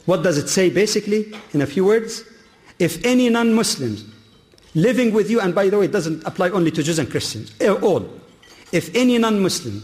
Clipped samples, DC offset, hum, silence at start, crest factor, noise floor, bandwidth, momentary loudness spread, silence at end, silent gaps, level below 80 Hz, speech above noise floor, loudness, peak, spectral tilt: under 0.1%; under 0.1%; none; 0.05 s; 12 dB; -50 dBFS; 15.5 kHz; 8 LU; 0 s; none; -56 dBFS; 32 dB; -19 LUFS; -6 dBFS; -5 dB/octave